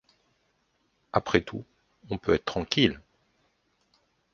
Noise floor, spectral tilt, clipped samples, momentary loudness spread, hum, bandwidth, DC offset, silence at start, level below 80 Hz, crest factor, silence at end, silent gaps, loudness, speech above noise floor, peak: -72 dBFS; -5.5 dB/octave; under 0.1%; 16 LU; none; 7.2 kHz; under 0.1%; 1.15 s; -52 dBFS; 28 dB; 1.35 s; none; -27 LUFS; 46 dB; -4 dBFS